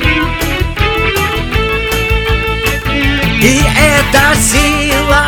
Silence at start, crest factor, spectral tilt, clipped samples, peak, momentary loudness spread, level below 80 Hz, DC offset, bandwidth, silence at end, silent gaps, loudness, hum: 0 s; 10 dB; -3.5 dB/octave; 0.1%; 0 dBFS; 6 LU; -18 dBFS; under 0.1%; 19.5 kHz; 0 s; none; -11 LUFS; none